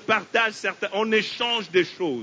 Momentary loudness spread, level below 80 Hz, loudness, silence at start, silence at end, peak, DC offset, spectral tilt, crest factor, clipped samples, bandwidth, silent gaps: 5 LU; -72 dBFS; -23 LUFS; 0 s; 0 s; -6 dBFS; under 0.1%; -3.5 dB/octave; 18 dB; under 0.1%; 8 kHz; none